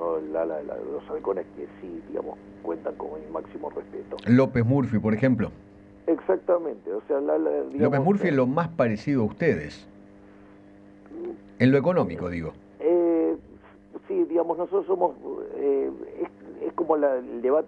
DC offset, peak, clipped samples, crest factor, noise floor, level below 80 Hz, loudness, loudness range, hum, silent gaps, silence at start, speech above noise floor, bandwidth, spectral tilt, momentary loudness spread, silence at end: under 0.1%; -4 dBFS; under 0.1%; 22 dB; -50 dBFS; -58 dBFS; -26 LUFS; 5 LU; none; none; 0 s; 25 dB; 7.8 kHz; -9.5 dB/octave; 16 LU; 0 s